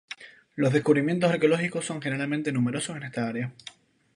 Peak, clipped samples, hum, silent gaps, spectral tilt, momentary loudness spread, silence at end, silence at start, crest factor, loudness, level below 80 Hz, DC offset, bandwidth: -8 dBFS; under 0.1%; none; none; -6 dB/octave; 19 LU; 0.45 s; 0.1 s; 20 dB; -26 LUFS; -70 dBFS; under 0.1%; 11 kHz